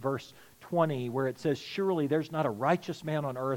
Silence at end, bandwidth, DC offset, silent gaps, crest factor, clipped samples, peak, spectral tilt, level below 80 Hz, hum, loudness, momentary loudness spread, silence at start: 0 s; 17 kHz; under 0.1%; none; 18 dB; under 0.1%; -12 dBFS; -7 dB/octave; -74 dBFS; none; -31 LUFS; 5 LU; 0 s